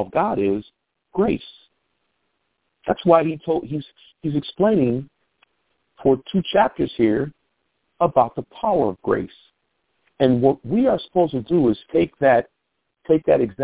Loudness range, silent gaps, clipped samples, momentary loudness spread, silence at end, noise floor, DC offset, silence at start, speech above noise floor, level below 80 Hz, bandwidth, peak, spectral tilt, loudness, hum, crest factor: 4 LU; none; under 0.1%; 11 LU; 0 s; -75 dBFS; under 0.1%; 0 s; 56 dB; -52 dBFS; 4 kHz; -2 dBFS; -11 dB/octave; -21 LUFS; none; 20 dB